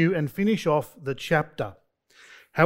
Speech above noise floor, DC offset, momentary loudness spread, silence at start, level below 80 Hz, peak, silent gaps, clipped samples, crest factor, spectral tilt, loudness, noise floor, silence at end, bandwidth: 31 dB; under 0.1%; 10 LU; 0 s; -56 dBFS; -4 dBFS; none; under 0.1%; 22 dB; -6.5 dB/octave; -26 LUFS; -56 dBFS; 0 s; 16 kHz